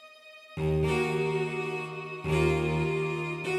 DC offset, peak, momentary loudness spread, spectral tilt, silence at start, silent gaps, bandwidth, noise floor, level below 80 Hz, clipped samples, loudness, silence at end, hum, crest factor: under 0.1%; -14 dBFS; 10 LU; -6.5 dB/octave; 0 s; none; 13.5 kHz; -51 dBFS; -46 dBFS; under 0.1%; -29 LUFS; 0 s; none; 16 dB